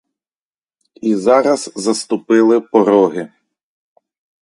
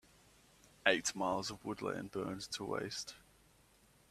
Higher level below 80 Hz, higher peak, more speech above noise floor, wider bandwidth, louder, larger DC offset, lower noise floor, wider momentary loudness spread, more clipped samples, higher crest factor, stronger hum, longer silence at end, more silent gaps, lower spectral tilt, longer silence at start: first, -64 dBFS vs -70 dBFS; first, 0 dBFS vs -12 dBFS; first, over 77 dB vs 29 dB; second, 11.5 kHz vs 15 kHz; first, -14 LUFS vs -38 LUFS; neither; first, under -90 dBFS vs -68 dBFS; about the same, 9 LU vs 11 LU; neither; second, 16 dB vs 28 dB; neither; first, 1.15 s vs 0.9 s; neither; first, -5 dB/octave vs -3 dB/octave; first, 1.05 s vs 0.85 s